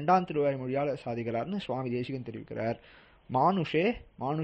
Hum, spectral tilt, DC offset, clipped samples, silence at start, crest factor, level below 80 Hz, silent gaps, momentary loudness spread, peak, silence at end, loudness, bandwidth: none; -8 dB/octave; under 0.1%; under 0.1%; 0 s; 18 dB; -60 dBFS; none; 10 LU; -14 dBFS; 0 s; -31 LUFS; 8.4 kHz